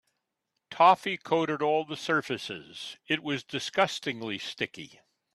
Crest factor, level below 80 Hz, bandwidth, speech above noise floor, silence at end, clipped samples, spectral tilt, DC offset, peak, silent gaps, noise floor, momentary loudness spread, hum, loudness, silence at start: 20 dB; -74 dBFS; 13 kHz; 54 dB; 0.5 s; under 0.1%; -4 dB/octave; under 0.1%; -8 dBFS; none; -83 dBFS; 18 LU; none; -28 LUFS; 0.7 s